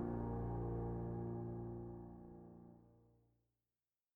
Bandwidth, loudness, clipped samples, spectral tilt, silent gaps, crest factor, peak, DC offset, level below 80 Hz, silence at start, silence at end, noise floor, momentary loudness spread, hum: 2.4 kHz; -46 LUFS; under 0.1%; -12 dB/octave; none; 16 dB; -32 dBFS; under 0.1%; -56 dBFS; 0 s; 1.15 s; under -90 dBFS; 17 LU; none